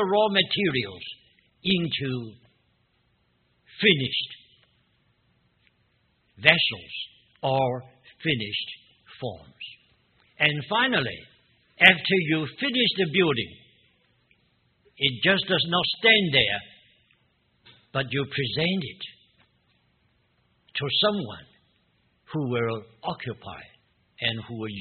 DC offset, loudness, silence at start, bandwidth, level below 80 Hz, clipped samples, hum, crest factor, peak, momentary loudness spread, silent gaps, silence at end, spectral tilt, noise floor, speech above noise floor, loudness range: under 0.1%; -24 LUFS; 0 s; 4.6 kHz; -62 dBFS; under 0.1%; none; 28 dB; 0 dBFS; 20 LU; none; 0 s; -2 dB/octave; -68 dBFS; 44 dB; 8 LU